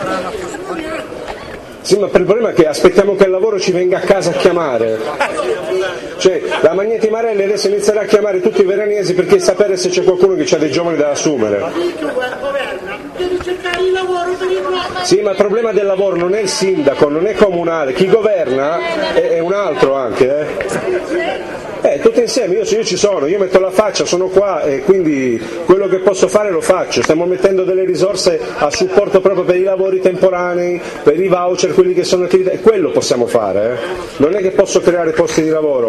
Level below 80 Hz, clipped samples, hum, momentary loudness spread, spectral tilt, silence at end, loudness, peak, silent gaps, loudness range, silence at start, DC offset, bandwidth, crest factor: -46 dBFS; 0.1%; none; 7 LU; -4.5 dB/octave; 0 s; -14 LUFS; 0 dBFS; none; 3 LU; 0 s; under 0.1%; 12.5 kHz; 14 dB